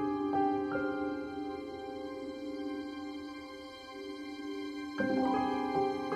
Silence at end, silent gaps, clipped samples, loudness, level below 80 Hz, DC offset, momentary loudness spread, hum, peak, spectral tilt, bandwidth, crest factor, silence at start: 0 s; none; under 0.1%; -36 LUFS; -68 dBFS; under 0.1%; 13 LU; none; -18 dBFS; -6 dB/octave; 11 kHz; 16 dB; 0 s